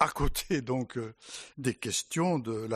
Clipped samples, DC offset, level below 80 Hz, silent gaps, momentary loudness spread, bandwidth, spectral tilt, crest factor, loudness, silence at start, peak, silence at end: under 0.1%; under 0.1%; -42 dBFS; none; 11 LU; 15 kHz; -4.5 dB/octave; 22 dB; -32 LUFS; 0 s; -10 dBFS; 0 s